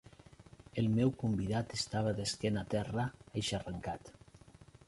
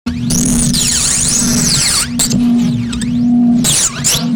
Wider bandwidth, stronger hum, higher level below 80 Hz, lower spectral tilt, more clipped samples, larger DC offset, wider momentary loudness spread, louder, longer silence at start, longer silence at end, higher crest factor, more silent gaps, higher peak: second, 11.5 kHz vs over 20 kHz; neither; second, -58 dBFS vs -30 dBFS; first, -5.5 dB/octave vs -3 dB/octave; neither; neither; first, 10 LU vs 5 LU; second, -36 LUFS vs -11 LUFS; first, 0.4 s vs 0.05 s; first, 0.25 s vs 0 s; first, 18 dB vs 10 dB; neither; second, -18 dBFS vs -2 dBFS